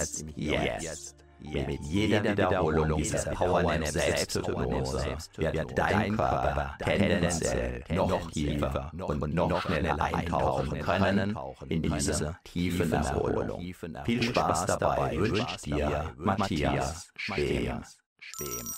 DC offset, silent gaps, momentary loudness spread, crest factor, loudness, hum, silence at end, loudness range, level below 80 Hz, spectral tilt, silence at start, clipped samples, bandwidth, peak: under 0.1%; 18.06-18.16 s; 9 LU; 20 dB; -29 LUFS; none; 0 s; 2 LU; -42 dBFS; -5 dB/octave; 0 s; under 0.1%; 16 kHz; -10 dBFS